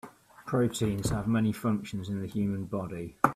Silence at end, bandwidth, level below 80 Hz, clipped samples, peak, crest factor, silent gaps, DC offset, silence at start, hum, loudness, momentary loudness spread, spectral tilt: 0 s; 15 kHz; -52 dBFS; under 0.1%; -6 dBFS; 24 dB; none; under 0.1%; 0.05 s; none; -31 LUFS; 8 LU; -6.5 dB/octave